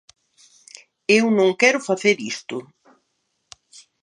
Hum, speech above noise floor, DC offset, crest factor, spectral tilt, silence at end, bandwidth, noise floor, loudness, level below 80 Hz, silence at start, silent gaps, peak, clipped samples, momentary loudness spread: none; 54 dB; under 0.1%; 22 dB; -3.5 dB/octave; 1.4 s; 10.5 kHz; -72 dBFS; -19 LUFS; -76 dBFS; 1.1 s; none; -2 dBFS; under 0.1%; 15 LU